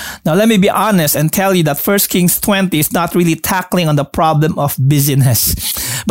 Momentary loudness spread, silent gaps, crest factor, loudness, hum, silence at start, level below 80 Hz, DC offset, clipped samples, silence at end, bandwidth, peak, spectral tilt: 4 LU; none; 12 dB; -12 LUFS; none; 0 s; -36 dBFS; 0.3%; under 0.1%; 0 s; 16.5 kHz; -2 dBFS; -4.5 dB/octave